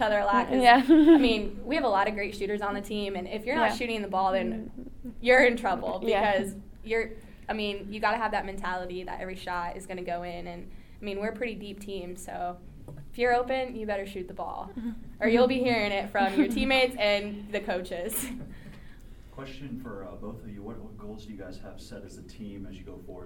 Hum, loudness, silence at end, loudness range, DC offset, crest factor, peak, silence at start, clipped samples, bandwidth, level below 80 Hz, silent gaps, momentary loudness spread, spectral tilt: none; -27 LUFS; 0 s; 15 LU; under 0.1%; 22 dB; -6 dBFS; 0 s; under 0.1%; 19 kHz; -46 dBFS; none; 22 LU; -4.5 dB/octave